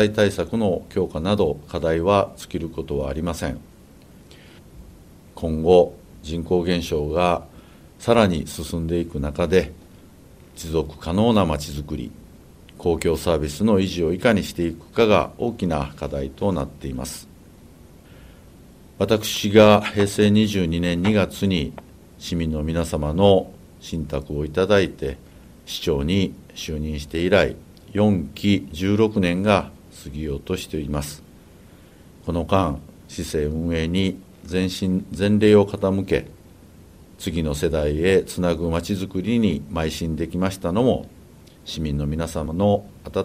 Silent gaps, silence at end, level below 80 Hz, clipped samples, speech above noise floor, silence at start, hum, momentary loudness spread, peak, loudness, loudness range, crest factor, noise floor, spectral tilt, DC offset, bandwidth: none; 0 s; -38 dBFS; under 0.1%; 26 dB; 0 s; none; 13 LU; 0 dBFS; -22 LUFS; 6 LU; 22 dB; -47 dBFS; -6 dB/octave; under 0.1%; 16 kHz